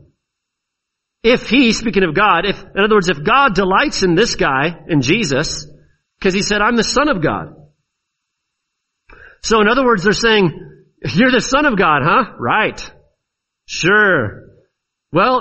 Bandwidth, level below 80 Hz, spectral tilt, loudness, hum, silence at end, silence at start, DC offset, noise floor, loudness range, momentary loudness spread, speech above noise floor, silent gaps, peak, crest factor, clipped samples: 8.4 kHz; -38 dBFS; -4.5 dB/octave; -14 LUFS; none; 0 s; 1.25 s; under 0.1%; -78 dBFS; 5 LU; 8 LU; 64 dB; none; 0 dBFS; 16 dB; under 0.1%